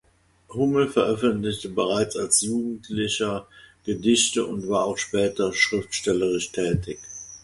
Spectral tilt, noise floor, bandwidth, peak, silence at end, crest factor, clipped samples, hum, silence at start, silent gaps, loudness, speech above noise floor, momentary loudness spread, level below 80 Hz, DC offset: -3.5 dB/octave; -53 dBFS; 12 kHz; -6 dBFS; 0.05 s; 20 dB; under 0.1%; none; 0.5 s; none; -23 LUFS; 29 dB; 10 LU; -50 dBFS; under 0.1%